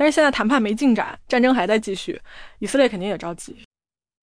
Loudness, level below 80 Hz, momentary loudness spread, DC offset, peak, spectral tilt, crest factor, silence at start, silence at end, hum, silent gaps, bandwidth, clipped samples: -20 LUFS; -50 dBFS; 15 LU; under 0.1%; -6 dBFS; -4.5 dB/octave; 16 dB; 0 s; 0.6 s; none; none; 10.5 kHz; under 0.1%